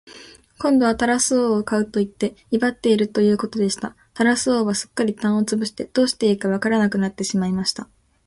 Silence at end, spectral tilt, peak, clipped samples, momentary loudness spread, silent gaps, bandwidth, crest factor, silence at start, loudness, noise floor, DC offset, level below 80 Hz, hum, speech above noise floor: 0.45 s; -4.5 dB/octave; -4 dBFS; under 0.1%; 7 LU; none; 11.5 kHz; 16 dB; 0.05 s; -20 LUFS; -45 dBFS; under 0.1%; -54 dBFS; none; 25 dB